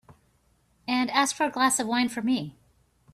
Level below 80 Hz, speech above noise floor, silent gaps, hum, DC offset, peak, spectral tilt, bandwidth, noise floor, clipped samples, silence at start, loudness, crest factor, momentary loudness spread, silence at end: -66 dBFS; 41 dB; none; none; under 0.1%; -10 dBFS; -2.5 dB/octave; 14.5 kHz; -66 dBFS; under 0.1%; 0.1 s; -25 LUFS; 18 dB; 8 LU; 0.65 s